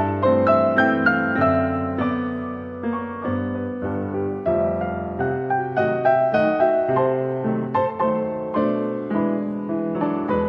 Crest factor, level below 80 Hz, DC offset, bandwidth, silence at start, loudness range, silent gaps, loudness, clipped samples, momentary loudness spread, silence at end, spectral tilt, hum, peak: 16 dB; -52 dBFS; under 0.1%; 5.8 kHz; 0 s; 4 LU; none; -22 LUFS; under 0.1%; 9 LU; 0 s; -9.5 dB/octave; none; -4 dBFS